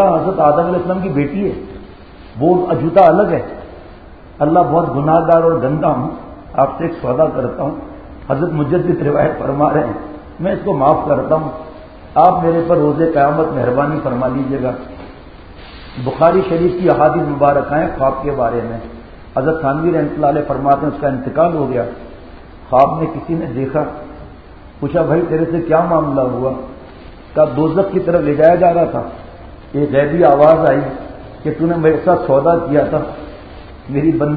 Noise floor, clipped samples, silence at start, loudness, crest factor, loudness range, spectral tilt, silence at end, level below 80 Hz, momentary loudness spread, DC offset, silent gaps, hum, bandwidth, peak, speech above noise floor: -37 dBFS; under 0.1%; 0 s; -15 LUFS; 14 dB; 4 LU; -11 dB/octave; 0 s; -38 dBFS; 18 LU; 0.3%; none; none; 4.9 kHz; 0 dBFS; 23 dB